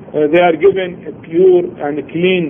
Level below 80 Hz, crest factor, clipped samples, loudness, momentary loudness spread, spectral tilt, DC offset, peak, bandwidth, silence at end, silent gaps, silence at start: -52 dBFS; 12 dB; under 0.1%; -13 LUFS; 11 LU; -9.5 dB/octave; under 0.1%; 0 dBFS; 3.6 kHz; 0 s; none; 0 s